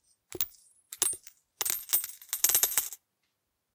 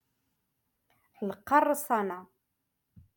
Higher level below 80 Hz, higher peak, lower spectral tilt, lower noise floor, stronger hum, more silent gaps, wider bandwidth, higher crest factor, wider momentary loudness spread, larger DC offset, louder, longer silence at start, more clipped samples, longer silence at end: about the same, -70 dBFS vs -74 dBFS; first, -4 dBFS vs -12 dBFS; second, 1.5 dB/octave vs -5 dB/octave; about the same, -81 dBFS vs -82 dBFS; neither; neither; about the same, 19 kHz vs 17.5 kHz; first, 30 dB vs 22 dB; first, 18 LU vs 14 LU; neither; about the same, -28 LUFS vs -29 LUFS; second, 0.3 s vs 1.2 s; neither; second, 0.8 s vs 0.95 s